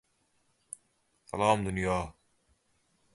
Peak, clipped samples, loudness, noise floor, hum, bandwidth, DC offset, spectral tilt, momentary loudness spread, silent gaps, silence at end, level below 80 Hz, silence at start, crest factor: -10 dBFS; under 0.1%; -30 LUFS; -73 dBFS; none; 11.5 kHz; under 0.1%; -5.5 dB/octave; 20 LU; none; 1.05 s; -54 dBFS; 1.35 s; 24 dB